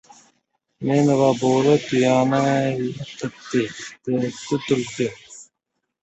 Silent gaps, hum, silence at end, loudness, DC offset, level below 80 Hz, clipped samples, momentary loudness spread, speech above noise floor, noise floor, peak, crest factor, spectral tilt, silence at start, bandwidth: none; none; 0.6 s; -21 LUFS; under 0.1%; -60 dBFS; under 0.1%; 13 LU; 59 dB; -79 dBFS; -4 dBFS; 18 dB; -6 dB/octave; 0.8 s; 8.2 kHz